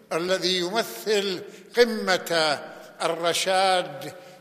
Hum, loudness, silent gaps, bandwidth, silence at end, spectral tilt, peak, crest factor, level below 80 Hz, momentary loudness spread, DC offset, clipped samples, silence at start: none; -24 LUFS; none; 15 kHz; 0 s; -2.5 dB/octave; -4 dBFS; 22 dB; -68 dBFS; 13 LU; under 0.1%; under 0.1%; 0.1 s